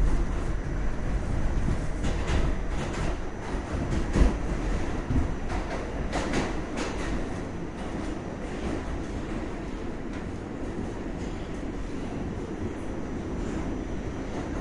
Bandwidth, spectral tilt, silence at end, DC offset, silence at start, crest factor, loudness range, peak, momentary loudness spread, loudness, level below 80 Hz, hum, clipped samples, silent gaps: 11 kHz; -6.5 dB/octave; 0 s; under 0.1%; 0 s; 22 dB; 5 LU; -8 dBFS; 6 LU; -32 LUFS; -32 dBFS; none; under 0.1%; none